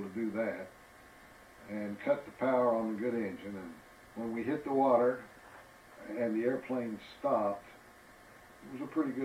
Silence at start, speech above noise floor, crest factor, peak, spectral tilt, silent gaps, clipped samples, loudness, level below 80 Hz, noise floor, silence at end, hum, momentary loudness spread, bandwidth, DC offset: 0 s; 24 dB; 20 dB; -16 dBFS; -7 dB/octave; none; under 0.1%; -34 LUFS; -72 dBFS; -57 dBFS; 0 s; none; 24 LU; 16 kHz; under 0.1%